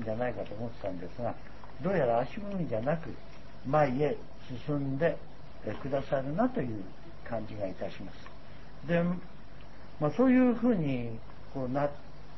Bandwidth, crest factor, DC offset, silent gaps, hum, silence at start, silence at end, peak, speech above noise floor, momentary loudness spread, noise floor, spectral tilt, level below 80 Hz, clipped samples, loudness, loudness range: 6 kHz; 18 dB; 1%; none; none; 0 s; 0 s; -12 dBFS; 19 dB; 22 LU; -50 dBFS; -9 dB/octave; -54 dBFS; under 0.1%; -32 LUFS; 5 LU